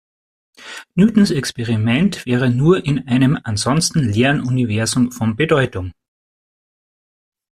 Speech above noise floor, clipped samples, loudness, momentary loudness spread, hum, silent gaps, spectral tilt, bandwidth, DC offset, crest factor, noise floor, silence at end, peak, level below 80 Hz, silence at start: over 74 dB; under 0.1%; -17 LUFS; 7 LU; none; none; -5.5 dB/octave; 14 kHz; under 0.1%; 16 dB; under -90 dBFS; 1.6 s; -2 dBFS; -46 dBFS; 0.6 s